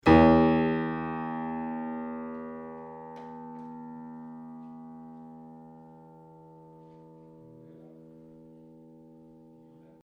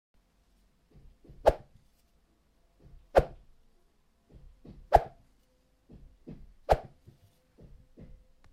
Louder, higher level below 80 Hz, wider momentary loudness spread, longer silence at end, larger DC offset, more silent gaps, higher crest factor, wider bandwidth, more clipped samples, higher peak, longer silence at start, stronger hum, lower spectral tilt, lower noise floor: about the same, -27 LUFS vs -29 LUFS; about the same, -48 dBFS vs -44 dBFS; first, 28 LU vs 25 LU; first, 4.25 s vs 1.7 s; neither; neither; second, 24 dB vs 30 dB; second, 6.2 kHz vs 15.5 kHz; neither; about the same, -6 dBFS vs -4 dBFS; second, 0.05 s vs 1.45 s; neither; first, -8.5 dB/octave vs -6.5 dB/octave; second, -55 dBFS vs -69 dBFS